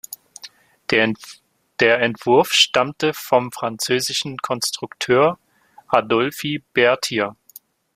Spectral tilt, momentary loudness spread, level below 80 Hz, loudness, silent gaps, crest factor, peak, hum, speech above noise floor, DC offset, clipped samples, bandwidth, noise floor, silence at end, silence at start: -3 dB/octave; 17 LU; -62 dBFS; -19 LUFS; none; 20 dB; 0 dBFS; none; 29 dB; under 0.1%; under 0.1%; 16 kHz; -48 dBFS; 0.65 s; 0.1 s